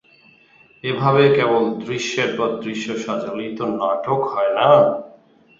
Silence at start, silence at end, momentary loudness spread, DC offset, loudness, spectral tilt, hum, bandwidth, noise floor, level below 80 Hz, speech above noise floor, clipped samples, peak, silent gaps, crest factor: 0.85 s; 0.5 s; 12 LU; under 0.1%; -19 LUFS; -5.5 dB/octave; none; 7.8 kHz; -52 dBFS; -62 dBFS; 34 dB; under 0.1%; -2 dBFS; none; 18 dB